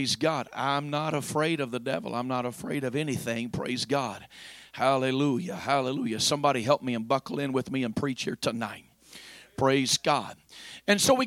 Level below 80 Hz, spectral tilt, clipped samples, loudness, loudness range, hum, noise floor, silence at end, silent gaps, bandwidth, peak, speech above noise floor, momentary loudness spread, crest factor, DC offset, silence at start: -64 dBFS; -4 dB/octave; under 0.1%; -28 LUFS; 3 LU; none; -50 dBFS; 0 s; none; 16.5 kHz; -8 dBFS; 22 dB; 18 LU; 20 dB; under 0.1%; 0 s